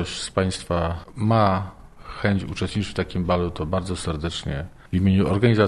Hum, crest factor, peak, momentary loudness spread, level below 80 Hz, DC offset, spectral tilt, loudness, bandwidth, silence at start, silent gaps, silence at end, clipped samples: none; 18 dB; -4 dBFS; 9 LU; -40 dBFS; under 0.1%; -6.5 dB/octave; -24 LUFS; 11.5 kHz; 0 s; none; 0 s; under 0.1%